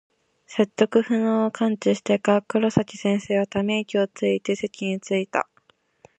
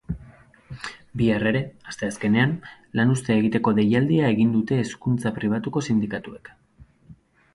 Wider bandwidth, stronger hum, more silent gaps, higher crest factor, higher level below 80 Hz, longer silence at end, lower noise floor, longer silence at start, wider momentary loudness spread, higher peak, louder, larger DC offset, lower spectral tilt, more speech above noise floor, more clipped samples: second, 8.8 kHz vs 11.5 kHz; neither; neither; about the same, 20 dB vs 18 dB; second, -60 dBFS vs -50 dBFS; first, 0.75 s vs 0.4 s; first, -62 dBFS vs -53 dBFS; first, 0.5 s vs 0.1 s; second, 7 LU vs 16 LU; first, -2 dBFS vs -6 dBFS; about the same, -23 LUFS vs -23 LUFS; neither; about the same, -6 dB/octave vs -7 dB/octave; first, 40 dB vs 31 dB; neither